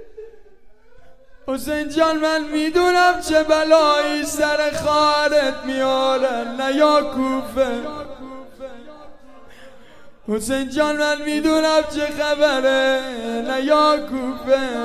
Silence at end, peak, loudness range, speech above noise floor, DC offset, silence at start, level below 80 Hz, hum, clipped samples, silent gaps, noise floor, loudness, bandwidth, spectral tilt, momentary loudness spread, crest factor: 0 s; 0 dBFS; 8 LU; 30 dB; 0.8%; 0 s; -48 dBFS; none; under 0.1%; none; -49 dBFS; -18 LUFS; 15.5 kHz; -3 dB/octave; 12 LU; 18 dB